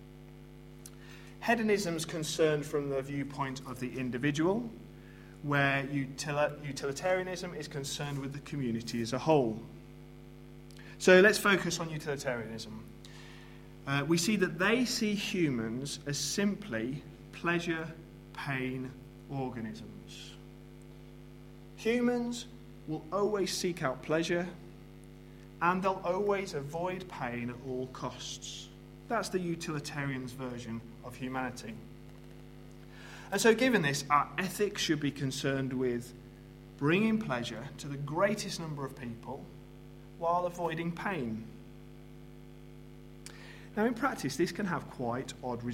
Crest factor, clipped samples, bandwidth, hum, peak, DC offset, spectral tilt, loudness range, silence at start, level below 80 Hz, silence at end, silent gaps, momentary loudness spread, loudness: 26 dB; under 0.1%; 16 kHz; none; -8 dBFS; under 0.1%; -4.5 dB/octave; 9 LU; 0 s; -58 dBFS; 0 s; none; 23 LU; -33 LUFS